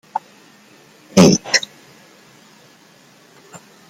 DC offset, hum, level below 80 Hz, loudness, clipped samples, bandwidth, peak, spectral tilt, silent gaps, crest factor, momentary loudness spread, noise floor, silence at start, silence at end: under 0.1%; none; -54 dBFS; -15 LUFS; under 0.1%; 15.5 kHz; 0 dBFS; -4.5 dB/octave; none; 20 dB; 18 LU; -49 dBFS; 0.15 s; 2.3 s